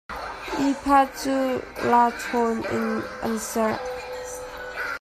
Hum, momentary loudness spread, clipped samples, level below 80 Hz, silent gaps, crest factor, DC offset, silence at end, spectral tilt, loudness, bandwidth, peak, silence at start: none; 14 LU; under 0.1%; -50 dBFS; none; 18 dB; under 0.1%; 0 s; -4 dB/octave; -25 LUFS; 15.5 kHz; -6 dBFS; 0.1 s